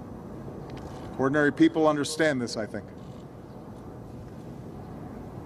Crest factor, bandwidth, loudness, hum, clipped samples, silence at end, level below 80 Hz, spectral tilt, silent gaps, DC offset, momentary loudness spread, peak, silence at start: 20 dB; 13.5 kHz; -25 LUFS; none; under 0.1%; 0 s; -54 dBFS; -5.5 dB/octave; none; under 0.1%; 21 LU; -10 dBFS; 0 s